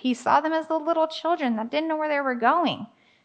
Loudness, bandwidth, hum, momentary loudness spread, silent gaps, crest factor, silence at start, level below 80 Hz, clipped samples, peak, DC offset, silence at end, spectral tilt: -24 LUFS; 9.2 kHz; none; 5 LU; none; 18 dB; 0.05 s; -80 dBFS; under 0.1%; -6 dBFS; under 0.1%; 0.4 s; -4.5 dB/octave